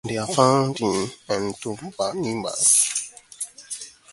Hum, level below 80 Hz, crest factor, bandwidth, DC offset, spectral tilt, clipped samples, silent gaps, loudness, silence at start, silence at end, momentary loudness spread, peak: none; -60 dBFS; 22 dB; 12 kHz; under 0.1%; -3.5 dB/octave; under 0.1%; none; -21 LUFS; 0.05 s; 0.25 s; 17 LU; -2 dBFS